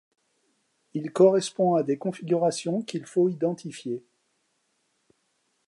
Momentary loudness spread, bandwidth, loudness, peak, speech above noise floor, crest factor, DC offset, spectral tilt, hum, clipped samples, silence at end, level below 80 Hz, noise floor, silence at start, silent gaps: 15 LU; 11.5 kHz; -25 LUFS; -8 dBFS; 48 dB; 20 dB; under 0.1%; -6 dB/octave; none; under 0.1%; 1.7 s; -80 dBFS; -73 dBFS; 0.95 s; none